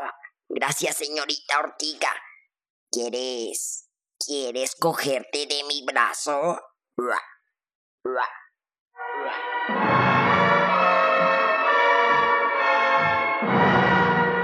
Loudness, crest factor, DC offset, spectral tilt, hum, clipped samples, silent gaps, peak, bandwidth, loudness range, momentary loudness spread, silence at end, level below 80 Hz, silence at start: -22 LUFS; 20 dB; under 0.1%; -3.5 dB/octave; none; under 0.1%; 2.70-2.87 s, 7.75-7.98 s, 8.80-8.86 s; -4 dBFS; 15 kHz; 9 LU; 12 LU; 0 s; -66 dBFS; 0 s